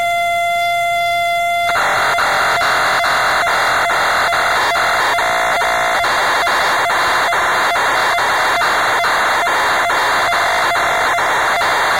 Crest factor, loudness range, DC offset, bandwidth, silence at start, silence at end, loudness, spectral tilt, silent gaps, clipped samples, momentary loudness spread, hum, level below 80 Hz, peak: 10 dB; 0 LU; 0.5%; 16 kHz; 0 s; 0 s; -14 LUFS; -1 dB/octave; none; under 0.1%; 2 LU; none; -46 dBFS; -4 dBFS